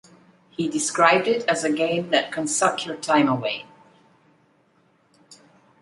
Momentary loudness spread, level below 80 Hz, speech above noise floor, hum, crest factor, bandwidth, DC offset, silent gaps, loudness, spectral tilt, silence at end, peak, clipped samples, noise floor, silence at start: 11 LU; -68 dBFS; 40 dB; none; 22 dB; 11.5 kHz; under 0.1%; none; -22 LUFS; -3 dB/octave; 0.5 s; -2 dBFS; under 0.1%; -62 dBFS; 0.6 s